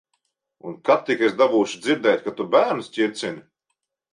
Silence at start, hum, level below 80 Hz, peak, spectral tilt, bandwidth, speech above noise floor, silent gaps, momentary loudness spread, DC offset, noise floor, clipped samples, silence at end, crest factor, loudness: 0.65 s; none; -72 dBFS; -6 dBFS; -4.5 dB/octave; 11 kHz; 57 dB; none; 13 LU; under 0.1%; -78 dBFS; under 0.1%; 0.75 s; 18 dB; -21 LUFS